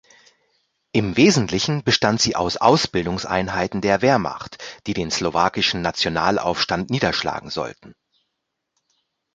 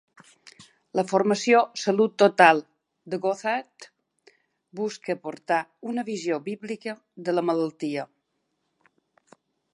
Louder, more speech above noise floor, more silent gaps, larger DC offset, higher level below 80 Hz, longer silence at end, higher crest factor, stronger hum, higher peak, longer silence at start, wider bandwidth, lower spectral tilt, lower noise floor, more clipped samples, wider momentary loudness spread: first, -20 LUFS vs -24 LUFS; first, 58 dB vs 52 dB; neither; neither; first, -48 dBFS vs -80 dBFS; second, 1.45 s vs 1.7 s; about the same, 20 dB vs 24 dB; neither; about the same, -2 dBFS vs -2 dBFS; first, 0.95 s vs 0.6 s; second, 9.4 kHz vs 11.5 kHz; about the same, -4 dB/octave vs -4.5 dB/octave; about the same, -78 dBFS vs -76 dBFS; neither; second, 11 LU vs 16 LU